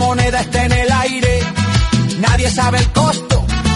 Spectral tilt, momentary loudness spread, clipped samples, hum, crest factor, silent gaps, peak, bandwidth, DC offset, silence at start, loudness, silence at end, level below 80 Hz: -5 dB/octave; 2 LU; under 0.1%; none; 14 dB; none; 0 dBFS; 11.5 kHz; under 0.1%; 0 s; -14 LUFS; 0 s; -22 dBFS